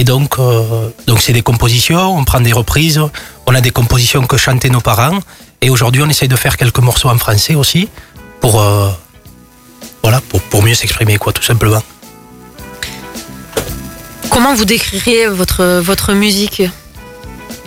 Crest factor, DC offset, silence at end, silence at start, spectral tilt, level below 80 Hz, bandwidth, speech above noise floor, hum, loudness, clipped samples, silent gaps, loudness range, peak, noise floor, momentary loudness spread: 12 dB; under 0.1%; 0 s; 0 s; -4.5 dB/octave; -28 dBFS; 16.5 kHz; 29 dB; none; -11 LUFS; under 0.1%; none; 4 LU; 0 dBFS; -39 dBFS; 14 LU